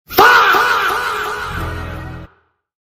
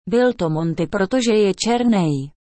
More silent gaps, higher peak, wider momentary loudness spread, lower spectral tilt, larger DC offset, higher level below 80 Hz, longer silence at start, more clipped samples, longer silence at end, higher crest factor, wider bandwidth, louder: neither; first, 0 dBFS vs -6 dBFS; first, 20 LU vs 5 LU; second, -3 dB/octave vs -5.5 dB/octave; neither; first, -36 dBFS vs -50 dBFS; about the same, 0.1 s vs 0.05 s; neither; first, 0.55 s vs 0.3 s; about the same, 16 dB vs 12 dB; first, 16 kHz vs 8.8 kHz; first, -13 LUFS vs -19 LUFS